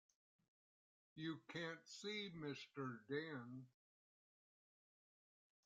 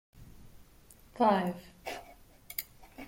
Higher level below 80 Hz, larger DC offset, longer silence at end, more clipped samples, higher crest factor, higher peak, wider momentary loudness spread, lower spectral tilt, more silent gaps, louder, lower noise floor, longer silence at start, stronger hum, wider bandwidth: second, under -90 dBFS vs -60 dBFS; neither; first, 1.95 s vs 0 s; neither; about the same, 20 dB vs 22 dB; second, -34 dBFS vs -14 dBFS; second, 10 LU vs 20 LU; about the same, -5 dB/octave vs -5.5 dB/octave; neither; second, -51 LUFS vs -33 LUFS; first, under -90 dBFS vs -58 dBFS; first, 1.15 s vs 0.15 s; neither; second, 9 kHz vs 16.5 kHz